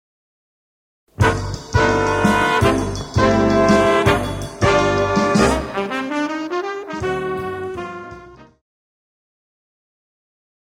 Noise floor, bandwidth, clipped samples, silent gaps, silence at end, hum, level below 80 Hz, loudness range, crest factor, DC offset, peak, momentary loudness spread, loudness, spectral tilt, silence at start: -40 dBFS; 16.5 kHz; under 0.1%; none; 2.2 s; none; -34 dBFS; 13 LU; 18 dB; under 0.1%; -2 dBFS; 12 LU; -18 LUFS; -5.5 dB/octave; 1.2 s